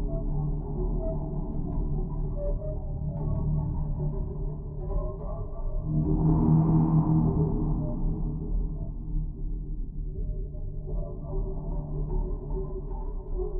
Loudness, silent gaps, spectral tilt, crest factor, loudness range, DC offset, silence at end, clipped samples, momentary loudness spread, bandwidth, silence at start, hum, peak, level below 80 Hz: -31 LUFS; none; -13.5 dB/octave; 16 dB; 10 LU; under 0.1%; 0 s; under 0.1%; 14 LU; 1.6 kHz; 0 s; none; -12 dBFS; -32 dBFS